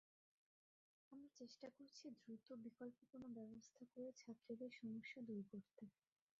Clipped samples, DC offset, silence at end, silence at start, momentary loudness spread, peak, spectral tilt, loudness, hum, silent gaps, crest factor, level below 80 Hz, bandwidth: under 0.1%; under 0.1%; 0.5 s; 1.1 s; 11 LU; -42 dBFS; -5.5 dB/octave; -58 LUFS; none; none; 16 dB; under -90 dBFS; 7.4 kHz